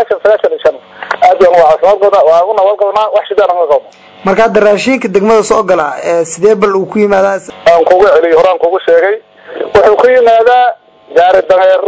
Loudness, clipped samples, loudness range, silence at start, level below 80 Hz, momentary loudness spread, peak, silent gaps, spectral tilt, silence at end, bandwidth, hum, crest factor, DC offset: -8 LUFS; 4%; 2 LU; 0 s; -44 dBFS; 7 LU; 0 dBFS; none; -4.5 dB/octave; 0 s; 8 kHz; none; 8 dB; under 0.1%